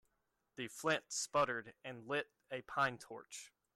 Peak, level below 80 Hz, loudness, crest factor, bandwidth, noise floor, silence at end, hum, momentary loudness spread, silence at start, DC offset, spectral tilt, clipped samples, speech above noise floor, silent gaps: -22 dBFS; -80 dBFS; -40 LUFS; 20 dB; 15.5 kHz; -84 dBFS; 0.25 s; none; 16 LU; 0.55 s; under 0.1%; -2.5 dB/octave; under 0.1%; 44 dB; none